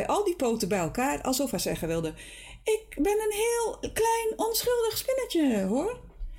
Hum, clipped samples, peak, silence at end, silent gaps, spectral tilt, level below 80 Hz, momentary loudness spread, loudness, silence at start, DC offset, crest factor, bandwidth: none; under 0.1%; -18 dBFS; 0 s; none; -4 dB/octave; -48 dBFS; 6 LU; -28 LUFS; 0 s; under 0.1%; 10 dB; 17 kHz